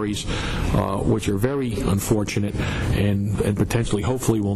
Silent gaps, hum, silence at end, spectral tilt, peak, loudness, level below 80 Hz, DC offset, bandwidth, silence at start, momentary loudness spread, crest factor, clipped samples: none; none; 0 s; -6 dB/octave; -10 dBFS; -23 LUFS; -32 dBFS; under 0.1%; 13.5 kHz; 0 s; 3 LU; 12 dB; under 0.1%